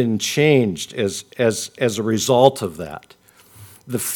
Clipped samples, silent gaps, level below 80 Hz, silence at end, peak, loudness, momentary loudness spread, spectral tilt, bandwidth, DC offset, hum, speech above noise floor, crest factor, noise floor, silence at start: under 0.1%; none; -58 dBFS; 0 s; 0 dBFS; -19 LUFS; 14 LU; -4.5 dB/octave; 19 kHz; under 0.1%; none; 27 dB; 20 dB; -46 dBFS; 0 s